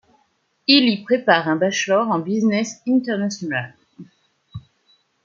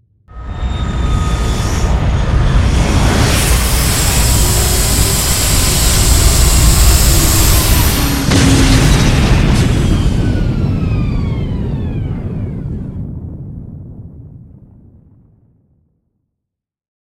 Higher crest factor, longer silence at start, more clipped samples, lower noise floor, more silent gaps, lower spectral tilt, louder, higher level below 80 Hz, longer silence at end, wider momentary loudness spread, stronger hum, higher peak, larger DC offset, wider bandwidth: first, 20 dB vs 12 dB; first, 0.7 s vs 0.3 s; neither; second, -65 dBFS vs -78 dBFS; neither; about the same, -4 dB/octave vs -4 dB/octave; second, -19 LUFS vs -12 LUFS; second, -64 dBFS vs -16 dBFS; second, 0.65 s vs 2.8 s; first, 23 LU vs 14 LU; neither; about the same, -2 dBFS vs 0 dBFS; neither; second, 7.6 kHz vs 17 kHz